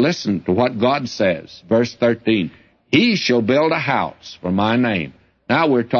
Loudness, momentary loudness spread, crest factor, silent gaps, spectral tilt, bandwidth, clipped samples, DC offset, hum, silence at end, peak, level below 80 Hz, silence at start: -18 LUFS; 8 LU; 14 dB; none; -6 dB/octave; 7 kHz; under 0.1%; under 0.1%; none; 0 s; -4 dBFS; -56 dBFS; 0 s